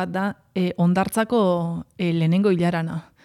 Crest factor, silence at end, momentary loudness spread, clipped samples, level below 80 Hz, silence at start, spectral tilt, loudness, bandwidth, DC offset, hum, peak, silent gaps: 14 dB; 0.25 s; 8 LU; under 0.1%; -58 dBFS; 0 s; -7 dB/octave; -22 LUFS; 14.5 kHz; under 0.1%; none; -8 dBFS; none